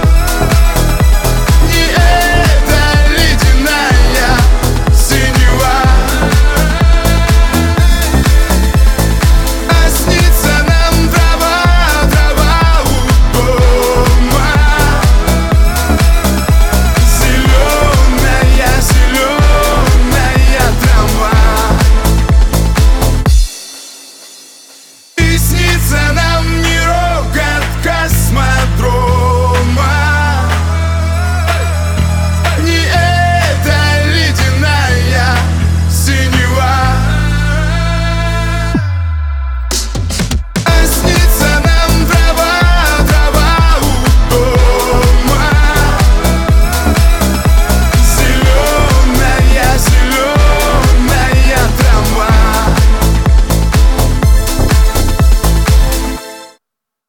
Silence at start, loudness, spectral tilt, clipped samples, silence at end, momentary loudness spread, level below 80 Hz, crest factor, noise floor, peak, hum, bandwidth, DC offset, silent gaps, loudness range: 0 s; -10 LUFS; -4.5 dB/octave; under 0.1%; 0.6 s; 4 LU; -10 dBFS; 8 dB; -78 dBFS; 0 dBFS; none; 18.5 kHz; under 0.1%; none; 3 LU